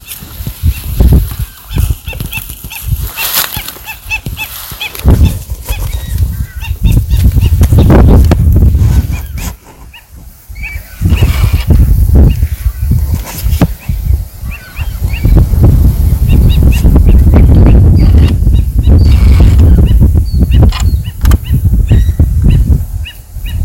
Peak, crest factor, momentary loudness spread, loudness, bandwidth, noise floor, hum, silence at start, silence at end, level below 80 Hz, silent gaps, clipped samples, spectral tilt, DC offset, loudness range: 0 dBFS; 8 dB; 15 LU; -10 LUFS; 17 kHz; -33 dBFS; none; 0.05 s; 0 s; -10 dBFS; none; 2%; -6.5 dB/octave; under 0.1%; 8 LU